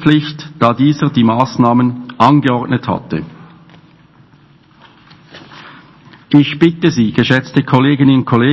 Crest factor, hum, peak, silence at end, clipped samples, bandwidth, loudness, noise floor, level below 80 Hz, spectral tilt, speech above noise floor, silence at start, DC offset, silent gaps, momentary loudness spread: 14 dB; none; 0 dBFS; 0 s; 0.5%; 8 kHz; -12 LUFS; -46 dBFS; -48 dBFS; -7.5 dB/octave; 35 dB; 0 s; under 0.1%; none; 9 LU